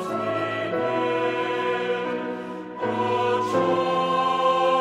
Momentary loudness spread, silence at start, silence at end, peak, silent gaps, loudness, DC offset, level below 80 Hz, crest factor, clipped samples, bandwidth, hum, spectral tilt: 8 LU; 0 s; 0 s; -8 dBFS; none; -24 LUFS; under 0.1%; -68 dBFS; 14 dB; under 0.1%; 11.5 kHz; none; -5.5 dB/octave